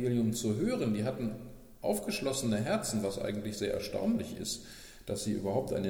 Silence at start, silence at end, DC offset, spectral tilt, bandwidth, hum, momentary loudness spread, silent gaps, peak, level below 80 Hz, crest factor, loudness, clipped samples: 0 s; 0 s; under 0.1%; -5 dB/octave; 19 kHz; none; 8 LU; none; -18 dBFS; -56 dBFS; 16 dB; -34 LUFS; under 0.1%